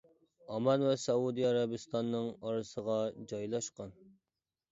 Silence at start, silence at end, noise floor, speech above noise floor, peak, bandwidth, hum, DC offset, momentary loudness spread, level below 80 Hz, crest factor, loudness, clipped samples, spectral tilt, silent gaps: 0.5 s; 0.8 s; under -90 dBFS; over 56 dB; -18 dBFS; 8 kHz; none; under 0.1%; 11 LU; -74 dBFS; 18 dB; -35 LUFS; under 0.1%; -5.5 dB/octave; none